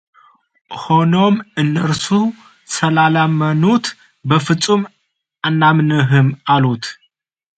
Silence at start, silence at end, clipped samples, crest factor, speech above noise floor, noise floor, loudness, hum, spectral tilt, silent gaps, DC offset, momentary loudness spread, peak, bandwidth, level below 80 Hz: 0.7 s; 0.65 s; under 0.1%; 16 dB; 49 dB; -63 dBFS; -15 LUFS; none; -6 dB/octave; none; under 0.1%; 12 LU; 0 dBFS; 9.2 kHz; -56 dBFS